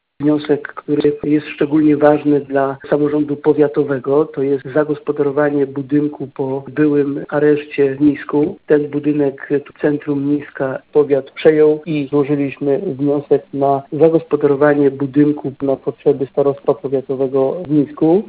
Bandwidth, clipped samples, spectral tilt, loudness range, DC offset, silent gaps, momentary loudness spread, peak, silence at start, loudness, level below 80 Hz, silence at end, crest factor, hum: 4 kHz; under 0.1%; -12 dB/octave; 2 LU; under 0.1%; none; 6 LU; 0 dBFS; 0.2 s; -16 LUFS; -56 dBFS; 0 s; 16 dB; none